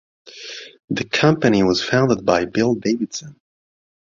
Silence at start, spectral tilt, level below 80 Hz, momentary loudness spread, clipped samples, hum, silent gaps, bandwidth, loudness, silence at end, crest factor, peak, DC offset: 0.25 s; -5.5 dB/octave; -52 dBFS; 17 LU; under 0.1%; none; 0.84-0.88 s; 7.6 kHz; -18 LUFS; 0.8 s; 18 dB; -2 dBFS; under 0.1%